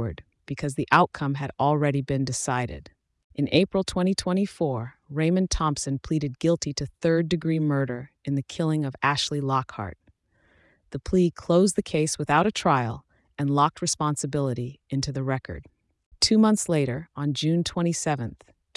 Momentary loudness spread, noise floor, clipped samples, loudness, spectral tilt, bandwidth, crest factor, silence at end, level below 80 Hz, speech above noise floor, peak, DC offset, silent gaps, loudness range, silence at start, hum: 13 LU; -64 dBFS; under 0.1%; -25 LUFS; -5 dB/octave; 12 kHz; 20 dB; 0.4 s; -48 dBFS; 39 dB; -6 dBFS; under 0.1%; 3.24-3.30 s, 16.06-16.11 s; 3 LU; 0 s; none